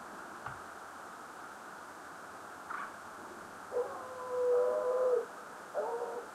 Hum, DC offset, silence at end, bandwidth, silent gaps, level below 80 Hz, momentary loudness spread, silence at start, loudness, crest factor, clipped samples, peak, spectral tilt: none; under 0.1%; 0 s; 14.5 kHz; none; -76 dBFS; 17 LU; 0 s; -38 LUFS; 16 dB; under 0.1%; -22 dBFS; -4 dB/octave